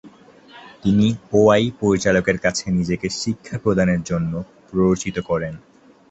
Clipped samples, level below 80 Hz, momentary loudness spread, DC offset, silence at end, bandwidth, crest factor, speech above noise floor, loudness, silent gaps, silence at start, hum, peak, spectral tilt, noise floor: under 0.1%; -44 dBFS; 10 LU; under 0.1%; 0.55 s; 8.2 kHz; 18 dB; 27 dB; -20 LUFS; none; 0.05 s; none; -2 dBFS; -6 dB/octave; -46 dBFS